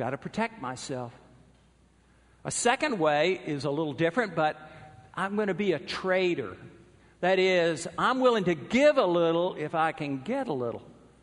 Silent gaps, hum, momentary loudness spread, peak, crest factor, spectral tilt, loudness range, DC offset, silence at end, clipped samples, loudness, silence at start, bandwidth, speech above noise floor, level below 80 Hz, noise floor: none; none; 14 LU; -8 dBFS; 20 dB; -4.5 dB/octave; 5 LU; under 0.1%; 0.3 s; under 0.1%; -27 LUFS; 0 s; 10.5 kHz; 34 dB; -64 dBFS; -61 dBFS